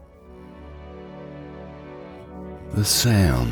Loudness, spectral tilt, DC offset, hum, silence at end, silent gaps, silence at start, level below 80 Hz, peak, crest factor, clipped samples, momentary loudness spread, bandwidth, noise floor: -19 LUFS; -4.5 dB/octave; under 0.1%; none; 0 s; none; 0.3 s; -38 dBFS; -6 dBFS; 18 dB; under 0.1%; 24 LU; over 20 kHz; -44 dBFS